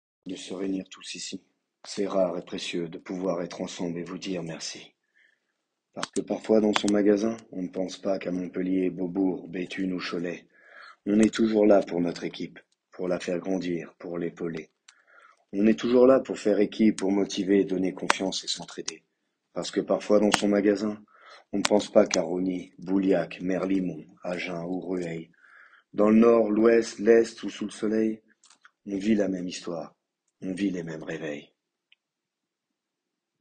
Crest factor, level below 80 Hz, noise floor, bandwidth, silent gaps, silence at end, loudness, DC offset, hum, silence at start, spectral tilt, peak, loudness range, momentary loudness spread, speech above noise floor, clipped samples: 28 dB; -64 dBFS; -86 dBFS; 10 kHz; none; 1.95 s; -26 LUFS; under 0.1%; none; 0.25 s; -5 dB/octave; 0 dBFS; 10 LU; 15 LU; 60 dB; under 0.1%